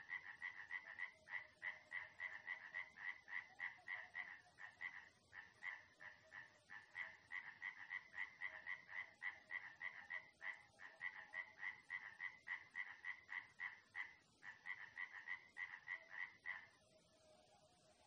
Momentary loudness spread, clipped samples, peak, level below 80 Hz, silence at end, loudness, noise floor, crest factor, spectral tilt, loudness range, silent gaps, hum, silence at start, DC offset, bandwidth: 9 LU; under 0.1%; -36 dBFS; under -90 dBFS; 0 s; -52 LUFS; -74 dBFS; 18 dB; -1.5 dB/octave; 3 LU; none; none; 0 s; under 0.1%; 9.6 kHz